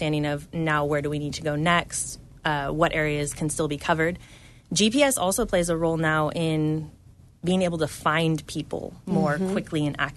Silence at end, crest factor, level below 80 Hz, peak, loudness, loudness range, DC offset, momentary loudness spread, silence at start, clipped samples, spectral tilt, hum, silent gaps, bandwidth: 0 s; 20 dB; -46 dBFS; -6 dBFS; -25 LUFS; 3 LU; under 0.1%; 8 LU; 0 s; under 0.1%; -4.5 dB/octave; none; none; 12.5 kHz